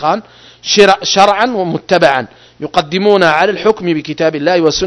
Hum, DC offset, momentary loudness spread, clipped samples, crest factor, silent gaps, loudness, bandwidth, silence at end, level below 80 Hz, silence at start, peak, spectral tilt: none; under 0.1%; 9 LU; 1%; 12 dB; none; -11 LUFS; 11 kHz; 0 s; -46 dBFS; 0 s; 0 dBFS; -4 dB/octave